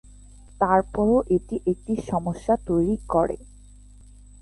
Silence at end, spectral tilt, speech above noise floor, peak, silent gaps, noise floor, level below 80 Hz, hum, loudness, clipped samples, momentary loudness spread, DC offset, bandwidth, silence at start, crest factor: 0.95 s; -8.5 dB/octave; 25 dB; -6 dBFS; none; -47 dBFS; -42 dBFS; 50 Hz at -40 dBFS; -24 LUFS; under 0.1%; 7 LU; under 0.1%; 11.5 kHz; 0.6 s; 18 dB